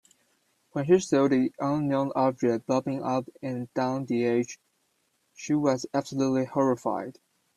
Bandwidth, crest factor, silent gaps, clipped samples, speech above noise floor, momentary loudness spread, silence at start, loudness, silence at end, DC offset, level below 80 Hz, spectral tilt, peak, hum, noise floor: 12 kHz; 18 dB; none; under 0.1%; 46 dB; 11 LU; 0.75 s; -27 LUFS; 0.45 s; under 0.1%; -68 dBFS; -6.5 dB/octave; -10 dBFS; none; -73 dBFS